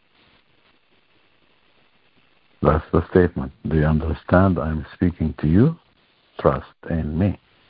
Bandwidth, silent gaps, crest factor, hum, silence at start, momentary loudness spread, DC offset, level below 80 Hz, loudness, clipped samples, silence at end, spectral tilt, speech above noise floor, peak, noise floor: 5 kHz; none; 20 dB; none; 2.6 s; 10 LU; under 0.1%; -34 dBFS; -21 LUFS; under 0.1%; 0.35 s; -13 dB/octave; 42 dB; -2 dBFS; -61 dBFS